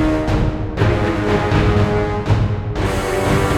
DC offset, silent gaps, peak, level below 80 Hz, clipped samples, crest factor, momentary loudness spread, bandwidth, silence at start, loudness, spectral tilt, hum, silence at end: under 0.1%; none; -2 dBFS; -26 dBFS; under 0.1%; 14 dB; 5 LU; 16 kHz; 0 s; -18 LUFS; -7 dB/octave; none; 0 s